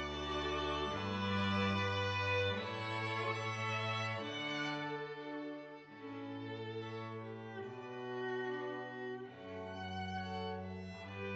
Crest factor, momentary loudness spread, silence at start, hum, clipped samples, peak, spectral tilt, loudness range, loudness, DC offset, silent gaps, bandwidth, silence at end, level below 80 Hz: 16 dB; 12 LU; 0 s; none; under 0.1%; -24 dBFS; -5.5 dB/octave; 8 LU; -40 LUFS; under 0.1%; none; 8.6 kHz; 0 s; -62 dBFS